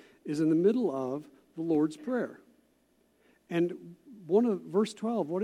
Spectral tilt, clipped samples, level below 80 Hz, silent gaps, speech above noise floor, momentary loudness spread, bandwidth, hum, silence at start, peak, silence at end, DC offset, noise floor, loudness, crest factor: -7.5 dB/octave; under 0.1%; -80 dBFS; none; 40 dB; 15 LU; 12 kHz; none; 0.25 s; -14 dBFS; 0 s; under 0.1%; -69 dBFS; -30 LUFS; 18 dB